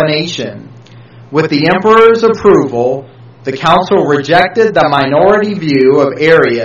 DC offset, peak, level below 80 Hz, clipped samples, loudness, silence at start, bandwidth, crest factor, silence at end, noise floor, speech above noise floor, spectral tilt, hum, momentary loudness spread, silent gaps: under 0.1%; 0 dBFS; -44 dBFS; 0.6%; -9 LUFS; 0 s; 7.4 kHz; 10 dB; 0 s; -35 dBFS; 26 dB; -6 dB/octave; none; 10 LU; none